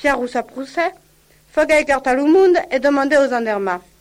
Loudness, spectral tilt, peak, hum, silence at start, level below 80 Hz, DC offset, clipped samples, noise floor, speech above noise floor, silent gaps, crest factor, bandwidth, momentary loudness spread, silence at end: -17 LUFS; -4 dB/octave; -4 dBFS; none; 0 s; -48 dBFS; under 0.1%; under 0.1%; -53 dBFS; 37 dB; none; 14 dB; 15.5 kHz; 11 LU; 0.2 s